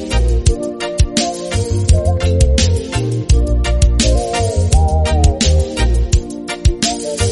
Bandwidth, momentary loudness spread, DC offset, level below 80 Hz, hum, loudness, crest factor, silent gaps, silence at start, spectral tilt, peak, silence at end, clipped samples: 11.5 kHz; 5 LU; under 0.1%; -16 dBFS; none; -15 LUFS; 14 dB; none; 0 s; -5 dB/octave; 0 dBFS; 0 s; under 0.1%